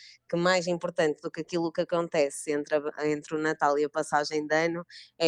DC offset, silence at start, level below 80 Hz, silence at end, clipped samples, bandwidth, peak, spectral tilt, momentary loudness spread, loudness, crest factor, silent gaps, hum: under 0.1%; 0 s; -74 dBFS; 0 s; under 0.1%; 13 kHz; -10 dBFS; -4.5 dB/octave; 6 LU; -28 LUFS; 18 dB; none; none